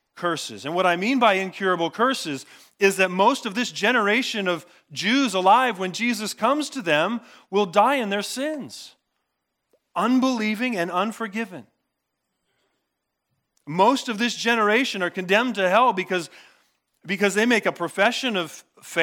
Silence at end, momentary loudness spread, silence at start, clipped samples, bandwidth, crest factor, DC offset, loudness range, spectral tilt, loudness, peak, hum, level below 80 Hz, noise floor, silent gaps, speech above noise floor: 0 s; 11 LU; 0.15 s; under 0.1%; 18 kHz; 20 dB; under 0.1%; 5 LU; -3.5 dB/octave; -22 LUFS; -4 dBFS; none; -84 dBFS; -79 dBFS; none; 57 dB